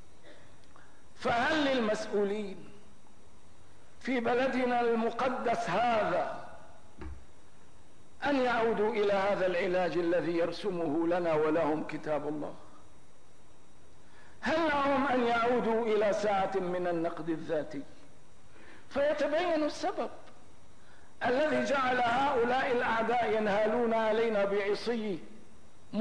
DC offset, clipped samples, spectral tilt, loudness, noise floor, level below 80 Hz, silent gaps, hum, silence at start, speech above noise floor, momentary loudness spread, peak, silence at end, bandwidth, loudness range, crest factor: 0.8%; under 0.1%; -5.5 dB/octave; -30 LUFS; -61 dBFS; -62 dBFS; none; none; 0.25 s; 31 dB; 10 LU; -18 dBFS; 0 s; 10.5 kHz; 5 LU; 12 dB